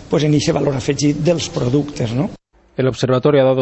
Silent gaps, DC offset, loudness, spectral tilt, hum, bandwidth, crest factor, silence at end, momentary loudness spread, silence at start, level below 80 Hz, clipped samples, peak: none; under 0.1%; -17 LUFS; -6 dB/octave; none; 8.4 kHz; 14 dB; 0 s; 7 LU; 0 s; -44 dBFS; under 0.1%; -2 dBFS